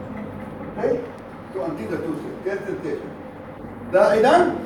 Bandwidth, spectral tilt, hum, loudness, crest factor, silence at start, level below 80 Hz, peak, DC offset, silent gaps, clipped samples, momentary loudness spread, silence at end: 17 kHz; -6 dB/octave; none; -22 LUFS; 20 dB; 0 s; -52 dBFS; -4 dBFS; under 0.1%; none; under 0.1%; 21 LU; 0 s